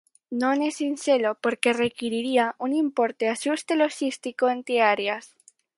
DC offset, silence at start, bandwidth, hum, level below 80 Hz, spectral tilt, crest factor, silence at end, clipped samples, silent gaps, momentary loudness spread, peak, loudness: under 0.1%; 0.3 s; 11.5 kHz; none; -74 dBFS; -3.5 dB/octave; 22 dB; 0.5 s; under 0.1%; none; 6 LU; -4 dBFS; -24 LUFS